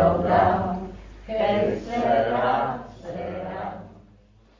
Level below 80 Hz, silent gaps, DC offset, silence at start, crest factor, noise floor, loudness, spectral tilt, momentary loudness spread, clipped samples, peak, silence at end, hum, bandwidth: -44 dBFS; none; under 0.1%; 0 s; 18 dB; -54 dBFS; -24 LUFS; -7.5 dB/octave; 16 LU; under 0.1%; -6 dBFS; 0.6 s; none; 7.4 kHz